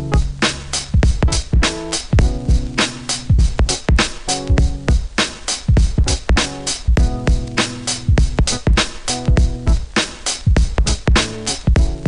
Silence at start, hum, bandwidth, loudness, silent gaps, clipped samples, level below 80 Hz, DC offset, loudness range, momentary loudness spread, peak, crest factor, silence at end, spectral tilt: 0 s; none; 11 kHz; -18 LUFS; none; under 0.1%; -18 dBFS; under 0.1%; 1 LU; 4 LU; -2 dBFS; 14 dB; 0 s; -4 dB/octave